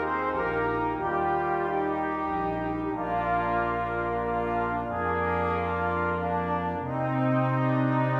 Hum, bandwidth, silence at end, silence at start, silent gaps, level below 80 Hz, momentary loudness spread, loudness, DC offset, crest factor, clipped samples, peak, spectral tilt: none; 6 kHz; 0 s; 0 s; none; -48 dBFS; 4 LU; -28 LUFS; under 0.1%; 14 dB; under 0.1%; -14 dBFS; -9 dB/octave